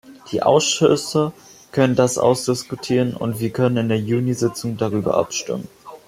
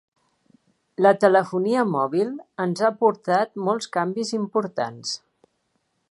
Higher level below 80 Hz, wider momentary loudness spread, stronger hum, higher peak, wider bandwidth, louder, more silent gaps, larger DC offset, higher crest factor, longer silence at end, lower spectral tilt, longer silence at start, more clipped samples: first, -58 dBFS vs -76 dBFS; about the same, 9 LU vs 10 LU; neither; about the same, -2 dBFS vs -2 dBFS; first, 16 kHz vs 11.5 kHz; about the same, -20 LUFS vs -22 LUFS; neither; neither; about the same, 18 dB vs 22 dB; second, 0.1 s vs 0.95 s; about the same, -5 dB/octave vs -5.5 dB/octave; second, 0.05 s vs 1 s; neither